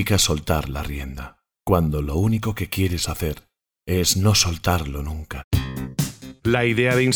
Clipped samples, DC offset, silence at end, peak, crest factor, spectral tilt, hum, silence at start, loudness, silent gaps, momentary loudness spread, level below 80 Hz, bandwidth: under 0.1%; under 0.1%; 0 s; -4 dBFS; 18 dB; -4.5 dB/octave; none; 0 s; -22 LUFS; 5.44-5.51 s; 14 LU; -34 dBFS; over 20 kHz